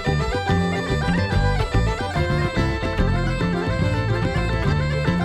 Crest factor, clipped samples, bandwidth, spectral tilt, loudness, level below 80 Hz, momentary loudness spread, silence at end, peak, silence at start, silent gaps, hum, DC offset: 14 dB; under 0.1%; 11.5 kHz; -6.5 dB/octave; -22 LUFS; -28 dBFS; 2 LU; 0 s; -8 dBFS; 0 s; none; none; under 0.1%